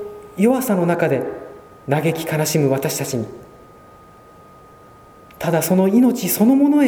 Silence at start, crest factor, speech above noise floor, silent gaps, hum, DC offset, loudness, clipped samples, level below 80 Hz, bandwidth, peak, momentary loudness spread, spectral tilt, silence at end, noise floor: 0 s; 16 dB; 28 dB; none; none; under 0.1%; -18 LUFS; under 0.1%; -56 dBFS; over 20 kHz; -2 dBFS; 16 LU; -6 dB/octave; 0 s; -45 dBFS